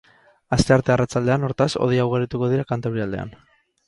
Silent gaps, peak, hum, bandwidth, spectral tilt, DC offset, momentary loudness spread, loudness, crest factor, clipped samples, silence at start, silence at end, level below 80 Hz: none; -2 dBFS; none; 11.5 kHz; -6.5 dB/octave; under 0.1%; 9 LU; -21 LUFS; 20 dB; under 0.1%; 0.5 s; 0.55 s; -44 dBFS